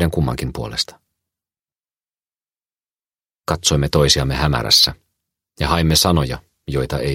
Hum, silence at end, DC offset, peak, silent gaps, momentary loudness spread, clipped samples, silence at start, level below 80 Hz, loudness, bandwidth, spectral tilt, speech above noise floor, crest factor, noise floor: none; 0 s; under 0.1%; 0 dBFS; 2.91-2.95 s; 13 LU; under 0.1%; 0 s; -32 dBFS; -17 LUFS; 16.5 kHz; -4 dB/octave; over 73 dB; 20 dB; under -90 dBFS